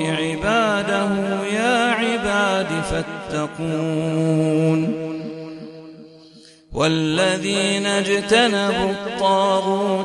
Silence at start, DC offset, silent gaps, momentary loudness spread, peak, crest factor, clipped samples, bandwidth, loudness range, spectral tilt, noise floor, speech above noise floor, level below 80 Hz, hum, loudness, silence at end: 0 s; under 0.1%; none; 10 LU; -2 dBFS; 18 dB; under 0.1%; 11.5 kHz; 4 LU; -4.5 dB/octave; -47 dBFS; 27 dB; -46 dBFS; none; -20 LUFS; 0 s